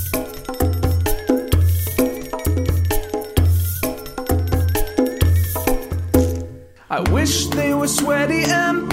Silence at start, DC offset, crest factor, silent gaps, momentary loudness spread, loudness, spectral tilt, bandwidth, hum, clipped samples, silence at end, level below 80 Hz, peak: 0 s; under 0.1%; 18 dB; none; 7 LU; -19 LUFS; -5 dB/octave; 16.5 kHz; none; under 0.1%; 0 s; -28 dBFS; 0 dBFS